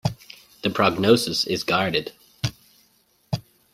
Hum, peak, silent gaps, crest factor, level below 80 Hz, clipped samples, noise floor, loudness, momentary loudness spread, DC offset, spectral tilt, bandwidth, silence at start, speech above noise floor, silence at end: none; -2 dBFS; none; 22 dB; -54 dBFS; under 0.1%; -63 dBFS; -23 LUFS; 13 LU; under 0.1%; -4.5 dB/octave; 16 kHz; 0.05 s; 41 dB; 0.35 s